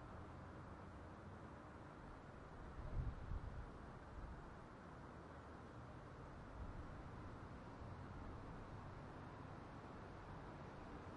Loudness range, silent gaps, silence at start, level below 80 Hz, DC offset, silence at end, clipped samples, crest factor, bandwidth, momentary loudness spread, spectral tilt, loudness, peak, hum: 2 LU; none; 0 s; -58 dBFS; under 0.1%; 0 s; under 0.1%; 20 dB; 10.5 kHz; 6 LU; -7.5 dB/octave; -56 LUFS; -34 dBFS; none